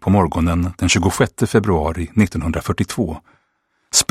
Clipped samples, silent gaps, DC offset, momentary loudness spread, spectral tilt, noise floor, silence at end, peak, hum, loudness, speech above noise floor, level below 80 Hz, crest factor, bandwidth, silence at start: under 0.1%; none; under 0.1%; 6 LU; -4.5 dB/octave; -67 dBFS; 0.05 s; 0 dBFS; none; -18 LUFS; 49 dB; -34 dBFS; 18 dB; 16 kHz; 0 s